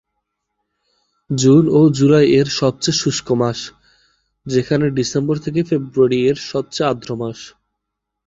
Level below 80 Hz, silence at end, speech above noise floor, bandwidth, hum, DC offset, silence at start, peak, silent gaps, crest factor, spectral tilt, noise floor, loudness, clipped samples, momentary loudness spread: -52 dBFS; 0.8 s; 63 dB; 8 kHz; none; under 0.1%; 1.3 s; -2 dBFS; none; 16 dB; -5.5 dB/octave; -79 dBFS; -16 LUFS; under 0.1%; 14 LU